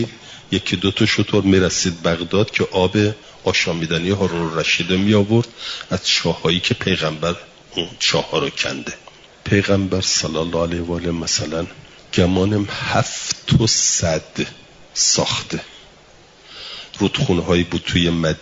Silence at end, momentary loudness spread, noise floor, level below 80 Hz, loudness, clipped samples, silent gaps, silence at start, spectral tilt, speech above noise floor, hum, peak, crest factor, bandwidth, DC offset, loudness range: 0 s; 12 LU; -47 dBFS; -46 dBFS; -18 LUFS; under 0.1%; none; 0 s; -4 dB/octave; 28 dB; none; -2 dBFS; 16 dB; 7.8 kHz; under 0.1%; 3 LU